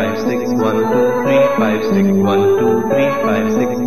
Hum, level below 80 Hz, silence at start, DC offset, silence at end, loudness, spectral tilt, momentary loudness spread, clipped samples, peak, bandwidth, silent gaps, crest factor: none; -52 dBFS; 0 s; 2%; 0 s; -14 LUFS; -6.5 dB/octave; 3 LU; under 0.1%; -2 dBFS; 13 kHz; none; 12 dB